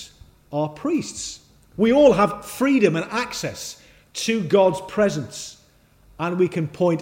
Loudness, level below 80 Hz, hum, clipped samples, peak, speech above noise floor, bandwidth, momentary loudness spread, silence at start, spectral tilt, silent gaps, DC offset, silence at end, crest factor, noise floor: -21 LUFS; -54 dBFS; none; under 0.1%; -4 dBFS; 35 dB; 16.5 kHz; 19 LU; 0 s; -5 dB/octave; none; under 0.1%; 0 s; 18 dB; -55 dBFS